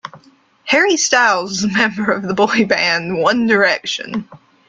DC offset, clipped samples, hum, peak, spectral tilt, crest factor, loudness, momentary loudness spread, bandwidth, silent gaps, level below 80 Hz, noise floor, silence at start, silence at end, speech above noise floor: under 0.1%; under 0.1%; none; -2 dBFS; -3 dB/octave; 16 dB; -15 LUFS; 10 LU; 9.4 kHz; none; -56 dBFS; -50 dBFS; 0.05 s; 0.3 s; 34 dB